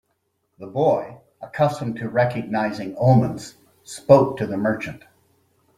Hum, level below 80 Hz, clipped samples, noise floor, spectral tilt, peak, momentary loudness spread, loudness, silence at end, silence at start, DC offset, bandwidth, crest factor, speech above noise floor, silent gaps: none; -58 dBFS; under 0.1%; -72 dBFS; -7.5 dB/octave; -2 dBFS; 21 LU; -21 LUFS; 0.8 s; 0.6 s; under 0.1%; 13.5 kHz; 20 dB; 51 dB; none